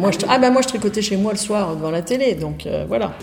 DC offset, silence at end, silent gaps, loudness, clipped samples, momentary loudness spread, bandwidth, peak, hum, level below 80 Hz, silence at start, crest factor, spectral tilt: under 0.1%; 0 s; none; -19 LUFS; under 0.1%; 9 LU; 17.5 kHz; -2 dBFS; none; -46 dBFS; 0 s; 16 dB; -4.5 dB/octave